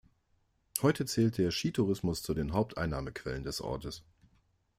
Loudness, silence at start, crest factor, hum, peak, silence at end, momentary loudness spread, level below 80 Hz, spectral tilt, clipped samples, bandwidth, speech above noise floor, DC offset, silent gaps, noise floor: -33 LUFS; 0.75 s; 26 dB; none; -6 dBFS; 0.8 s; 9 LU; -52 dBFS; -5.5 dB/octave; under 0.1%; 16 kHz; 41 dB; under 0.1%; none; -73 dBFS